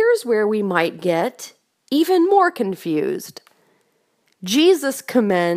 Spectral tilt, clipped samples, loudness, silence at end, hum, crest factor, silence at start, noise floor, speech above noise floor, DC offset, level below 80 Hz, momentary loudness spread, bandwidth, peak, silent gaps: -4.5 dB/octave; under 0.1%; -19 LUFS; 0 s; none; 18 dB; 0 s; -65 dBFS; 47 dB; under 0.1%; -72 dBFS; 14 LU; 15.5 kHz; -2 dBFS; none